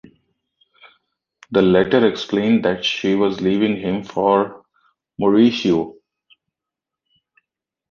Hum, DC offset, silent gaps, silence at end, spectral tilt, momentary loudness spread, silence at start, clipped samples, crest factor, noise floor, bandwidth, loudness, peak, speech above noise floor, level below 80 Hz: none; under 0.1%; none; 2 s; -6.5 dB/octave; 8 LU; 1.5 s; under 0.1%; 18 dB; -85 dBFS; 7 kHz; -18 LUFS; -2 dBFS; 69 dB; -54 dBFS